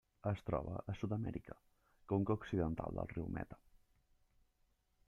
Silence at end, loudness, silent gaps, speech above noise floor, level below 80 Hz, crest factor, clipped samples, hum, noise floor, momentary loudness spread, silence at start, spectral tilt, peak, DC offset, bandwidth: 1.55 s; -42 LUFS; none; 38 dB; -60 dBFS; 20 dB; under 0.1%; none; -78 dBFS; 13 LU; 0.25 s; -9 dB/octave; -22 dBFS; under 0.1%; 7.2 kHz